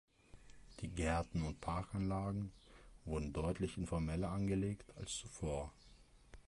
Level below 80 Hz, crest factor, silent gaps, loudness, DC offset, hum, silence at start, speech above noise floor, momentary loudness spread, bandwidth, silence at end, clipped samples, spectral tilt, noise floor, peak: -52 dBFS; 20 dB; none; -42 LUFS; under 0.1%; none; 0.35 s; 23 dB; 10 LU; 11.5 kHz; 0.05 s; under 0.1%; -6 dB/octave; -64 dBFS; -22 dBFS